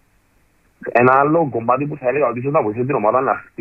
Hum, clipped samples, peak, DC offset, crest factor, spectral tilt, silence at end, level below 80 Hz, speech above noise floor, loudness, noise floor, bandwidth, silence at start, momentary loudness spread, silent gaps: none; under 0.1%; -2 dBFS; under 0.1%; 16 dB; -10.5 dB/octave; 0.2 s; -58 dBFS; 41 dB; -17 LUFS; -58 dBFS; 5.8 kHz; 0.8 s; 7 LU; none